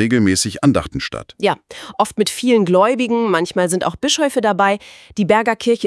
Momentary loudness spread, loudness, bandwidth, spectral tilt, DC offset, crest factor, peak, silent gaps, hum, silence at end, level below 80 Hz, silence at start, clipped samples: 10 LU; -17 LUFS; 12 kHz; -4.5 dB/octave; under 0.1%; 16 dB; 0 dBFS; none; none; 0 s; -48 dBFS; 0 s; under 0.1%